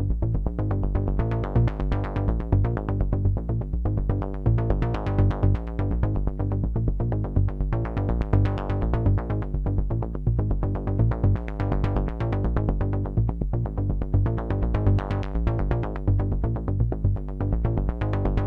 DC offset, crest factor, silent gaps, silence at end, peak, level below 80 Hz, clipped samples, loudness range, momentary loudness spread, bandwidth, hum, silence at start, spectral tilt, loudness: under 0.1%; 16 dB; none; 0 s; -6 dBFS; -28 dBFS; under 0.1%; 1 LU; 4 LU; 4.7 kHz; none; 0 s; -10.5 dB/octave; -26 LUFS